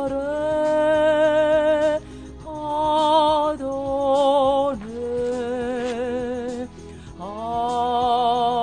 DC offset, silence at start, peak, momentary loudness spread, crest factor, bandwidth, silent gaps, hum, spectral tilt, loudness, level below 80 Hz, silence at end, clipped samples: 0.2%; 0 s; -6 dBFS; 15 LU; 14 dB; 10 kHz; none; none; -5 dB/octave; -21 LUFS; -46 dBFS; 0 s; under 0.1%